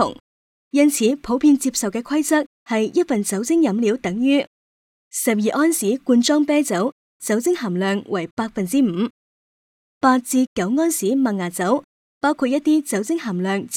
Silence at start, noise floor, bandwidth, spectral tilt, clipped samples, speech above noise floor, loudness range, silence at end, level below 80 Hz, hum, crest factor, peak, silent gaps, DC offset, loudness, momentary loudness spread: 0 s; under -90 dBFS; 17.5 kHz; -4.5 dB/octave; under 0.1%; over 71 dB; 2 LU; 0 s; -60 dBFS; none; 16 dB; -4 dBFS; 0.20-0.71 s, 2.46-2.66 s, 4.47-5.11 s, 6.92-7.20 s, 8.31-8.37 s, 9.10-10.01 s, 10.47-10.56 s, 11.84-12.21 s; under 0.1%; -20 LUFS; 7 LU